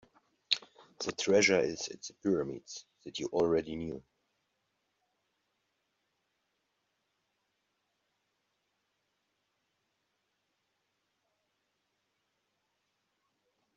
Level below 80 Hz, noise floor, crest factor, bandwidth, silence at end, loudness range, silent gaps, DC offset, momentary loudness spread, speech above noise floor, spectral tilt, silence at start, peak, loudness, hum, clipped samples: -72 dBFS; -81 dBFS; 28 dB; 7.4 kHz; 9.75 s; 8 LU; none; under 0.1%; 18 LU; 49 dB; -3 dB/octave; 0.5 s; -10 dBFS; -32 LUFS; 50 Hz at -75 dBFS; under 0.1%